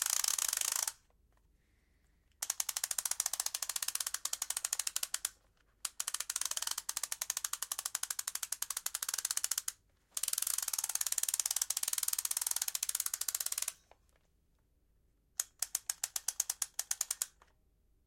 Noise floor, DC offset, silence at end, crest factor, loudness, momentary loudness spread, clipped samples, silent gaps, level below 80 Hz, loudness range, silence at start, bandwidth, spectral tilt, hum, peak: -73 dBFS; under 0.1%; 0.75 s; 28 dB; -35 LUFS; 6 LU; under 0.1%; none; -74 dBFS; 5 LU; 0 s; 17 kHz; 4 dB/octave; none; -12 dBFS